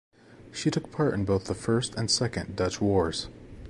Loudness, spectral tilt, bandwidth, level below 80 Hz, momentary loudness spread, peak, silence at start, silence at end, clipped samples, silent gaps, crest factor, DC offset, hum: -28 LUFS; -5 dB/octave; 11.5 kHz; -48 dBFS; 5 LU; -12 dBFS; 0.3 s; 0 s; under 0.1%; none; 16 dB; under 0.1%; none